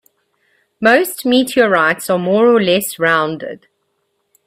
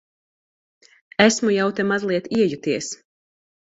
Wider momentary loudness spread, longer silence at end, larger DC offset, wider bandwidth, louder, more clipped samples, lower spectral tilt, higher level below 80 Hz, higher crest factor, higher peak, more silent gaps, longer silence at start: second, 6 LU vs 13 LU; about the same, 0.9 s vs 0.8 s; neither; first, 16 kHz vs 8 kHz; first, -14 LUFS vs -20 LUFS; neither; about the same, -4 dB/octave vs -4 dB/octave; about the same, -60 dBFS vs -60 dBFS; second, 16 dB vs 22 dB; about the same, 0 dBFS vs 0 dBFS; neither; second, 0.8 s vs 1.2 s